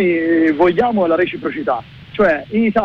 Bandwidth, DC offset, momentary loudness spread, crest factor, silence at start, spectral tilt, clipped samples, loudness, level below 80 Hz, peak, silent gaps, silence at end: 5.6 kHz; under 0.1%; 8 LU; 10 dB; 0 s; -8 dB/octave; under 0.1%; -16 LUFS; -46 dBFS; -6 dBFS; none; 0 s